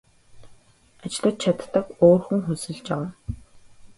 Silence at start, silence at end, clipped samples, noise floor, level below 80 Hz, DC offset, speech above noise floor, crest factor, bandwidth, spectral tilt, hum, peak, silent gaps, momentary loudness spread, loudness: 0.35 s; 0.1 s; under 0.1%; -55 dBFS; -48 dBFS; under 0.1%; 33 dB; 22 dB; 11.5 kHz; -6.5 dB/octave; none; -2 dBFS; none; 20 LU; -23 LUFS